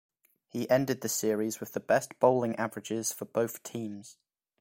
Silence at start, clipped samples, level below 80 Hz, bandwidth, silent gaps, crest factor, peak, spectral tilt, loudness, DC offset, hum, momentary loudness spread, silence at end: 0.55 s; under 0.1%; -72 dBFS; 16.5 kHz; none; 22 dB; -10 dBFS; -4.5 dB/octave; -30 LUFS; under 0.1%; none; 13 LU; 0.5 s